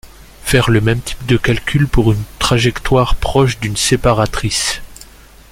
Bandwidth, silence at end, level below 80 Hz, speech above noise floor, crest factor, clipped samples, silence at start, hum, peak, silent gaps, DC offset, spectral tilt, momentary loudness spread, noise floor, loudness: 16.5 kHz; 0.5 s; -26 dBFS; 26 dB; 14 dB; under 0.1%; 0.05 s; none; 0 dBFS; none; under 0.1%; -5 dB/octave; 4 LU; -39 dBFS; -15 LUFS